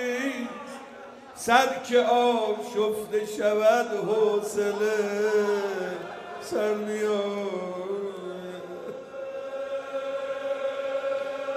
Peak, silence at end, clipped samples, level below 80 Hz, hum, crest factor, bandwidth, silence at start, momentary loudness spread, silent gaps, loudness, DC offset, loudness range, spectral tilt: -6 dBFS; 0 s; under 0.1%; -72 dBFS; none; 22 dB; 15.5 kHz; 0 s; 16 LU; none; -27 LUFS; under 0.1%; 9 LU; -4 dB/octave